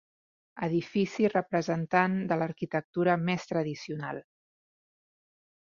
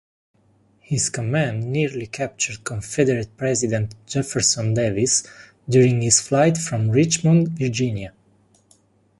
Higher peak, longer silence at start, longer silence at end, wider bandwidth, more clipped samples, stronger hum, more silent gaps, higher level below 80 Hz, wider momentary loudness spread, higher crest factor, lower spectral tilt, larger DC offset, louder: second, -8 dBFS vs -2 dBFS; second, 0.55 s vs 0.9 s; first, 1.4 s vs 1.1 s; second, 7.4 kHz vs 11.5 kHz; neither; neither; first, 2.84-2.93 s vs none; second, -70 dBFS vs -52 dBFS; about the same, 10 LU vs 10 LU; about the same, 22 dB vs 20 dB; first, -7 dB/octave vs -4.5 dB/octave; neither; second, -30 LUFS vs -20 LUFS